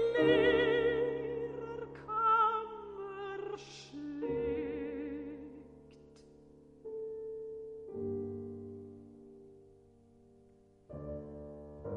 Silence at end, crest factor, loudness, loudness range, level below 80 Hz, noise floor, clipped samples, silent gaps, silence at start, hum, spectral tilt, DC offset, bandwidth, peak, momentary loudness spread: 0 s; 20 dB; -35 LUFS; 14 LU; -60 dBFS; -63 dBFS; under 0.1%; none; 0 s; none; -6.5 dB/octave; under 0.1%; 7.8 kHz; -16 dBFS; 23 LU